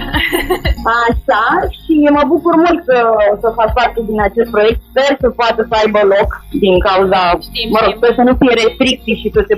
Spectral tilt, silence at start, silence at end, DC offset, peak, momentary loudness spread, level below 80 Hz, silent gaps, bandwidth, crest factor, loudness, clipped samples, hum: -5.5 dB/octave; 0 s; 0 s; under 0.1%; 0 dBFS; 5 LU; -26 dBFS; none; 15.5 kHz; 12 dB; -12 LUFS; under 0.1%; none